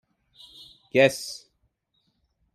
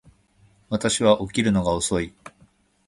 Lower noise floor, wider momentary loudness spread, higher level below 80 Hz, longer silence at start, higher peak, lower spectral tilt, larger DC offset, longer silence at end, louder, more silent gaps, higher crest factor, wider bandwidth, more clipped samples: first, -73 dBFS vs -59 dBFS; first, 25 LU vs 9 LU; second, -70 dBFS vs -46 dBFS; first, 0.95 s vs 0.7 s; about the same, -6 dBFS vs -4 dBFS; about the same, -4 dB/octave vs -4.5 dB/octave; neither; first, 1.15 s vs 0.6 s; about the same, -23 LUFS vs -22 LUFS; neither; about the same, 24 dB vs 20 dB; first, 15 kHz vs 11.5 kHz; neither